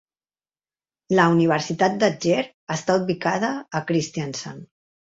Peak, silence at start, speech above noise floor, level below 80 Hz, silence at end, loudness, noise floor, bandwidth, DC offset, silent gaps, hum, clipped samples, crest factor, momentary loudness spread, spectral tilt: -4 dBFS; 1.1 s; over 68 dB; -62 dBFS; 0.4 s; -22 LUFS; under -90 dBFS; 7.8 kHz; under 0.1%; 2.54-2.67 s; none; under 0.1%; 20 dB; 12 LU; -5.5 dB/octave